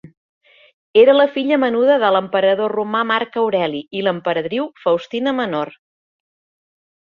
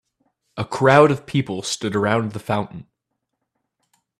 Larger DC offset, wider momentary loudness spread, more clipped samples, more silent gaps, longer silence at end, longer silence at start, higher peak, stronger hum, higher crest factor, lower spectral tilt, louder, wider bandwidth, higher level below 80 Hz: neither; second, 9 LU vs 19 LU; neither; first, 0.17-0.41 s, 0.73-0.94 s vs none; first, 1.5 s vs 1.35 s; second, 0.05 s vs 0.55 s; about the same, -2 dBFS vs 0 dBFS; neither; second, 16 dB vs 22 dB; first, -7 dB/octave vs -5.5 dB/octave; about the same, -17 LUFS vs -19 LUFS; second, 6.6 kHz vs 14 kHz; second, -64 dBFS vs -58 dBFS